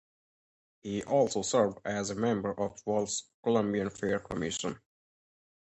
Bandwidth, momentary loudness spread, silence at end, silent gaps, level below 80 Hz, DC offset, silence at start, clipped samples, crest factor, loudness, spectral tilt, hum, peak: 9 kHz; 9 LU; 0.9 s; 3.34-3.43 s; -62 dBFS; under 0.1%; 0.85 s; under 0.1%; 20 dB; -31 LUFS; -4.5 dB/octave; none; -14 dBFS